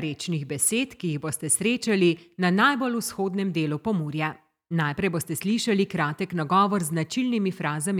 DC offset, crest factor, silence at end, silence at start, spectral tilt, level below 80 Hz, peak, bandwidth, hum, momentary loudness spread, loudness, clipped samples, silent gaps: under 0.1%; 18 dB; 0 s; 0 s; -4.5 dB/octave; -64 dBFS; -8 dBFS; 17 kHz; none; 8 LU; -25 LUFS; under 0.1%; none